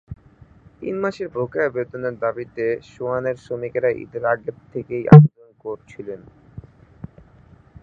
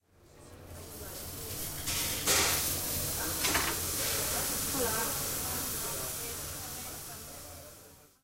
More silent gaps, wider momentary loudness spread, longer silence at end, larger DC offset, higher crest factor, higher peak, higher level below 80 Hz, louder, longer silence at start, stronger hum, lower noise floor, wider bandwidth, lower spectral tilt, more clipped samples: neither; first, 24 LU vs 17 LU; first, 1.25 s vs 0.2 s; neither; about the same, 20 dB vs 20 dB; first, 0 dBFS vs -14 dBFS; about the same, -50 dBFS vs -50 dBFS; first, -19 LUFS vs -31 LUFS; about the same, 0.1 s vs 0.2 s; neither; second, -50 dBFS vs -56 dBFS; second, 5 kHz vs 16 kHz; first, -10.5 dB/octave vs -1.5 dB/octave; neither